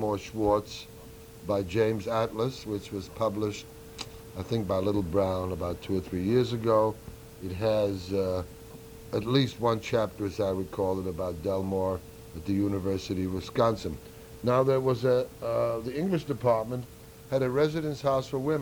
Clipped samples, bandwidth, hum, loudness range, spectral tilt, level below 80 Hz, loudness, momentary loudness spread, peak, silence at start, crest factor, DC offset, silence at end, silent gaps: under 0.1%; over 20 kHz; none; 3 LU; -7 dB/octave; -52 dBFS; -29 LUFS; 15 LU; -10 dBFS; 0 s; 20 dB; under 0.1%; 0 s; none